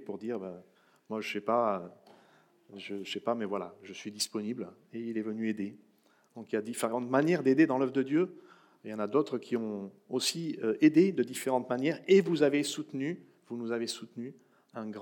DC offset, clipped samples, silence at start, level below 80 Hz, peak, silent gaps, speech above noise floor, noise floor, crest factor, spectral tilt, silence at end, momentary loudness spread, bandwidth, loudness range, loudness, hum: under 0.1%; under 0.1%; 0 s; under -90 dBFS; -12 dBFS; none; 36 dB; -67 dBFS; 20 dB; -5 dB/octave; 0 s; 18 LU; 18 kHz; 9 LU; -31 LUFS; none